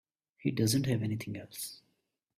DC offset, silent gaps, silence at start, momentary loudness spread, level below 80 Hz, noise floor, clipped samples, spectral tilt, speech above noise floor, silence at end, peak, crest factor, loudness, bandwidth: under 0.1%; none; 0.4 s; 12 LU; -64 dBFS; -79 dBFS; under 0.1%; -5 dB/octave; 47 dB; 0.65 s; -16 dBFS; 18 dB; -33 LUFS; 16 kHz